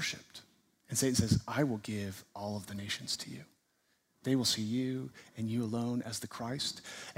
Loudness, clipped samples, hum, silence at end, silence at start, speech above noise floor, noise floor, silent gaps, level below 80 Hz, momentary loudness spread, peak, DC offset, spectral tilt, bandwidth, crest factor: -35 LUFS; under 0.1%; none; 0.05 s; 0 s; 41 dB; -76 dBFS; none; -60 dBFS; 14 LU; -14 dBFS; under 0.1%; -4 dB/octave; 16 kHz; 22 dB